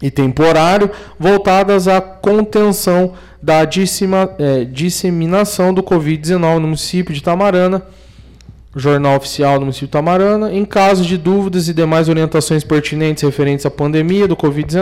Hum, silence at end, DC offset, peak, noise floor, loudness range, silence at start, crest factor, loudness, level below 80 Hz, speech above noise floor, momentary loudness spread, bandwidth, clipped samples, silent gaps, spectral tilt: none; 0 s; under 0.1%; -4 dBFS; -38 dBFS; 3 LU; 0 s; 8 dB; -13 LUFS; -40 dBFS; 25 dB; 5 LU; 16 kHz; under 0.1%; none; -6 dB/octave